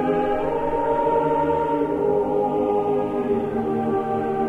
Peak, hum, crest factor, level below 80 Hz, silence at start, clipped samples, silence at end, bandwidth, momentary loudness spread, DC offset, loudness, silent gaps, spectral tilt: -10 dBFS; none; 12 dB; -46 dBFS; 0 s; under 0.1%; 0 s; 7.6 kHz; 3 LU; under 0.1%; -22 LUFS; none; -8.5 dB/octave